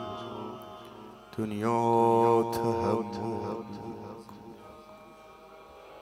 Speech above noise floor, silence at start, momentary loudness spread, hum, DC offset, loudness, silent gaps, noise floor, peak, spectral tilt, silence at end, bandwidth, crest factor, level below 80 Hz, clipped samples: 24 dB; 0 s; 27 LU; none; under 0.1%; -29 LUFS; none; -51 dBFS; -12 dBFS; -7 dB/octave; 0 s; 16 kHz; 20 dB; -66 dBFS; under 0.1%